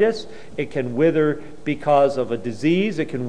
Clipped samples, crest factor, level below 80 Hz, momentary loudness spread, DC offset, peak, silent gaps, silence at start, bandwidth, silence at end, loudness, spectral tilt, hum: under 0.1%; 14 dB; -54 dBFS; 11 LU; 2%; -6 dBFS; none; 0 s; 10.5 kHz; 0 s; -21 LUFS; -7 dB/octave; none